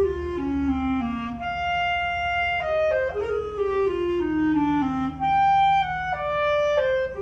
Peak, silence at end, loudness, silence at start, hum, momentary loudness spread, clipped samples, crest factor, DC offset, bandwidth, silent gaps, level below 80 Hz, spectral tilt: -10 dBFS; 0 s; -23 LUFS; 0 s; none; 7 LU; under 0.1%; 12 dB; under 0.1%; 7.8 kHz; none; -42 dBFS; -6.5 dB/octave